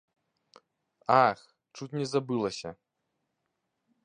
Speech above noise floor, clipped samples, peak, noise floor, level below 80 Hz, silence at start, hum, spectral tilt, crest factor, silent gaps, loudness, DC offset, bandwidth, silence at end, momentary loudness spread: 54 dB; under 0.1%; -8 dBFS; -81 dBFS; -72 dBFS; 1.1 s; none; -5.5 dB/octave; 24 dB; none; -28 LUFS; under 0.1%; 10 kHz; 1.3 s; 20 LU